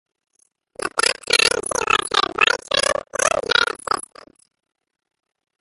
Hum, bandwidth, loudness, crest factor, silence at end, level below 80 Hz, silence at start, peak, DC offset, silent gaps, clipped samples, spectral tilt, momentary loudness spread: none; 12 kHz; -18 LUFS; 22 dB; 1.6 s; -54 dBFS; 0.8 s; 0 dBFS; under 0.1%; none; under 0.1%; 0 dB/octave; 9 LU